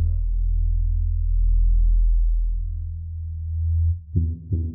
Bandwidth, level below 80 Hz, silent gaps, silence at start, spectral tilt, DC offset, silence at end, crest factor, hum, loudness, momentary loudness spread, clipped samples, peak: 0.5 kHz; -20 dBFS; none; 0 s; -18 dB/octave; under 0.1%; 0 s; 12 dB; none; -25 LUFS; 9 LU; under 0.1%; -10 dBFS